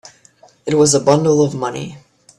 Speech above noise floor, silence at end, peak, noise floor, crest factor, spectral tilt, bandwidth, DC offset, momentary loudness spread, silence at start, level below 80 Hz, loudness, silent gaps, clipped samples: 35 dB; 0.4 s; 0 dBFS; -49 dBFS; 16 dB; -5 dB/octave; 13 kHz; under 0.1%; 17 LU; 0.65 s; -54 dBFS; -15 LUFS; none; under 0.1%